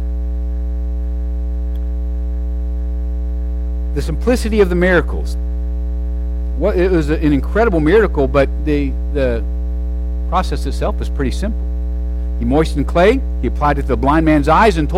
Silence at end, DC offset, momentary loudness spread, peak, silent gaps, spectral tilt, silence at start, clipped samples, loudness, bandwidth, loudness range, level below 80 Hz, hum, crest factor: 0 s; under 0.1%; 10 LU; -2 dBFS; none; -7.5 dB/octave; 0 s; under 0.1%; -17 LUFS; 11.5 kHz; 7 LU; -18 dBFS; none; 14 dB